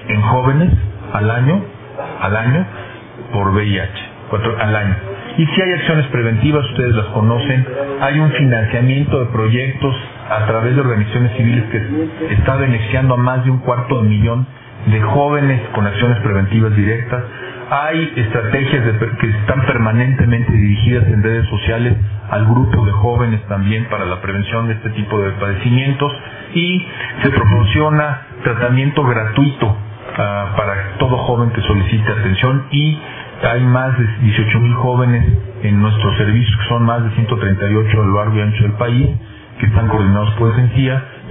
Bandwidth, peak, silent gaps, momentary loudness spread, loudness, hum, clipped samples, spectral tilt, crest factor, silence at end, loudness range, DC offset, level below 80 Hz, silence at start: 3.8 kHz; 0 dBFS; none; 7 LU; -15 LUFS; none; under 0.1%; -11.5 dB/octave; 14 dB; 0 s; 3 LU; under 0.1%; -32 dBFS; 0 s